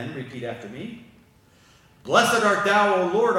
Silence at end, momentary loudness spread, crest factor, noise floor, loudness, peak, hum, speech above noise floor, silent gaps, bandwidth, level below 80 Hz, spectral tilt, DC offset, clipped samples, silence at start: 0 s; 18 LU; 22 dB; -56 dBFS; -20 LUFS; -2 dBFS; none; 34 dB; none; 17 kHz; -64 dBFS; -3.5 dB/octave; under 0.1%; under 0.1%; 0 s